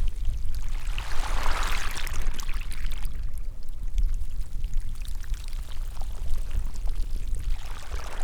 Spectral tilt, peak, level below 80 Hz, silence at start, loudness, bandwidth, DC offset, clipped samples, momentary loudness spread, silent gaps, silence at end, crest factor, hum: -3.5 dB/octave; -10 dBFS; -26 dBFS; 0 s; -35 LUFS; 13 kHz; under 0.1%; under 0.1%; 8 LU; none; 0 s; 14 dB; none